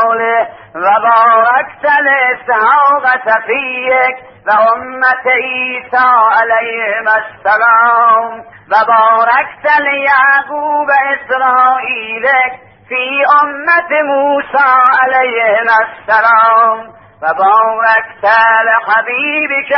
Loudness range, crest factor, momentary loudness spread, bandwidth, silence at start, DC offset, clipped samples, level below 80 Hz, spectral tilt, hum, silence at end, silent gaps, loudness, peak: 2 LU; 10 dB; 7 LU; 5.8 kHz; 0 s; under 0.1%; under 0.1%; -60 dBFS; -5.5 dB/octave; none; 0 s; none; -10 LUFS; 0 dBFS